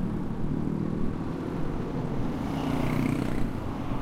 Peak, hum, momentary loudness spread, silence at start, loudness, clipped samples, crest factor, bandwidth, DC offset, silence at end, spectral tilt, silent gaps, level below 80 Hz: -14 dBFS; none; 5 LU; 0 s; -31 LUFS; under 0.1%; 14 dB; 15.5 kHz; under 0.1%; 0 s; -8 dB/octave; none; -38 dBFS